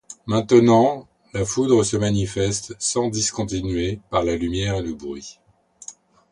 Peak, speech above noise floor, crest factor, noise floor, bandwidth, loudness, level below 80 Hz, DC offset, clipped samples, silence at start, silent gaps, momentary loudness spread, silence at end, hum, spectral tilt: -2 dBFS; 23 dB; 18 dB; -43 dBFS; 11 kHz; -21 LUFS; -42 dBFS; under 0.1%; under 0.1%; 0.1 s; none; 18 LU; 0.4 s; none; -5 dB/octave